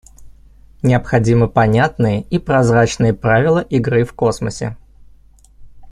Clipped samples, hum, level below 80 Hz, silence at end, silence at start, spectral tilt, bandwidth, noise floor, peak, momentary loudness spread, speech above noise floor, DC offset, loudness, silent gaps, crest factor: under 0.1%; none; -38 dBFS; 0 s; 0.2 s; -7 dB/octave; 11 kHz; -46 dBFS; -2 dBFS; 7 LU; 31 dB; under 0.1%; -15 LUFS; none; 14 dB